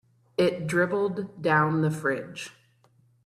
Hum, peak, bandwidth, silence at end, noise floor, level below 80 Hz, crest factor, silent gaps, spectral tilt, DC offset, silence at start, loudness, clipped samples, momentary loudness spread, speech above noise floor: none; -8 dBFS; 13 kHz; 0.75 s; -63 dBFS; -66 dBFS; 18 dB; none; -6.5 dB/octave; under 0.1%; 0.4 s; -26 LUFS; under 0.1%; 14 LU; 37 dB